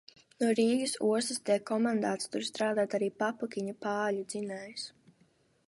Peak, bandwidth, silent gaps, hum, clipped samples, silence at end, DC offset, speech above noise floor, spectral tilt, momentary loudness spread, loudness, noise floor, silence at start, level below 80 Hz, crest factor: -16 dBFS; 11.5 kHz; none; none; under 0.1%; 0.8 s; under 0.1%; 37 dB; -4 dB/octave; 10 LU; -32 LUFS; -68 dBFS; 0.4 s; -82 dBFS; 16 dB